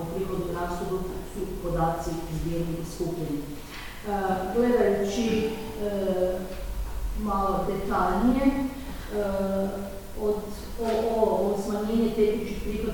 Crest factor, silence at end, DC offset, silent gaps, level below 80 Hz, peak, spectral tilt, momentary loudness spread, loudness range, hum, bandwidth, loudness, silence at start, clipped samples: 18 dB; 0 s; under 0.1%; none; -38 dBFS; -10 dBFS; -6.5 dB/octave; 11 LU; 4 LU; none; 19 kHz; -28 LUFS; 0 s; under 0.1%